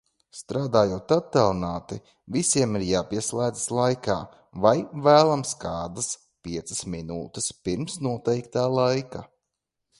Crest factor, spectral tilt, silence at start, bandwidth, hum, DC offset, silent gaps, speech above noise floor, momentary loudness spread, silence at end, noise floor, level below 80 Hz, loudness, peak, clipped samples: 24 dB; -4.5 dB/octave; 0.35 s; 11.5 kHz; none; under 0.1%; none; 58 dB; 13 LU; 0.75 s; -83 dBFS; -52 dBFS; -25 LUFS; -2 dBFS; under 0.1%